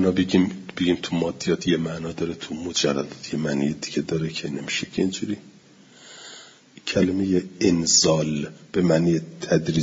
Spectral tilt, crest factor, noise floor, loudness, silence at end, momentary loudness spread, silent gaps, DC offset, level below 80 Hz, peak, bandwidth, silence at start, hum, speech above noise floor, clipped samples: -4.5 dB/octave; 18 dB; -51 dBFS; -23 LUFS; 0 s; 11 LU; none; under 0.1%; -56 dBFS; -6 dBFS; 7.8 kHz; 0 s; none; 28 dB; under 0.1%